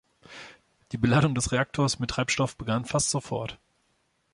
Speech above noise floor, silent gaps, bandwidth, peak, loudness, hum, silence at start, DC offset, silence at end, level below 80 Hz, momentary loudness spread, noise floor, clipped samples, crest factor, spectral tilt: 45 dB; none; 11.5 kHz; -10 dBFS; -26 LUFS; none; 0.3 s; under 0.1%; 0.8 s; -50 dBFS; 22 LU; -71 dBFS; under 0.1%; 20 dB; -4.5 dB/octave